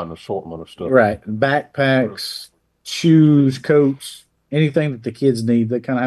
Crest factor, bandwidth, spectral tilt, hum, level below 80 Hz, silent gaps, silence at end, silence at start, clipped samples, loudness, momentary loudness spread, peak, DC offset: 16 dB; 12.5 kHz; -6.5 dB/octave; none; -56 dBFS; none; 0 s; 0 s; under 0.1%; -17 LUFS; 15 LU; 0 dBFS; under 0.1%